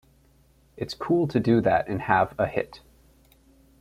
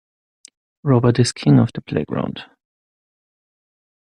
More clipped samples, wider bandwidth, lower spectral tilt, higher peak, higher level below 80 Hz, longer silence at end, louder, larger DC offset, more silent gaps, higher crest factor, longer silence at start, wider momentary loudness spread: neither; first, 14 kHz vs 10.5 kHz; about the same, -7.5 dB/octave vs -6.5 dB/octave; about the same, -4 dBFS vs -2 dBFS; about the same, -54 dBFS vs -52 dBFS; second, 1.05 s vs 1.6 s; second, -24 LUFS vs -18 LUFS; neither; neither; about the same, 22 dB vs 18 dB; about the same, 0.75 s vs 0.85 s; about the same, 14 LU vs 13 LU